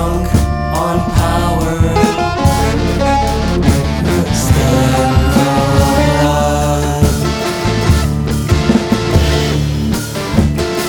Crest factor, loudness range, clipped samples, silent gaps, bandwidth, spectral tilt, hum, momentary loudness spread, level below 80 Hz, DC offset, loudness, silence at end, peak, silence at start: 12 dB; 2 LU; under 0.1%; none; over 20 kHz; -6 dB/octave; none; 4 LU; -20 dBFS; under 0.1%; -13 LUFS; 0 s; 0 dBFS; 0 s